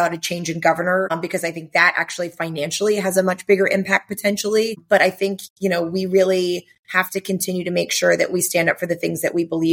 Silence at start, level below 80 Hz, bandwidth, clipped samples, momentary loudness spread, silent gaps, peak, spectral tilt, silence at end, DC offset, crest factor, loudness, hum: 0 s; -66 dBFS; 17 kHz; under 0.1%; 8 LU; 5.50-5.56 s, 6.79-6.83 s; 0 dBFS; -4 dB/octave; 0 s; under 0.1%; 18 dB; -19 LUFS; none